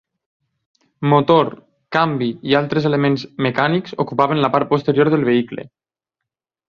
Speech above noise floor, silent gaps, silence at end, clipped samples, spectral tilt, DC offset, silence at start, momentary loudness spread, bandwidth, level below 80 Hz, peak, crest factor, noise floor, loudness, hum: 66 dB; none; 1.05 s; under 0.1%; -8 dB/octave; under 0.1%; 1 s; 7 LU; 7 kHz; -58 dBFS; -2 dBFS; 18 dB; -83 dBFS; -17 LUFS; none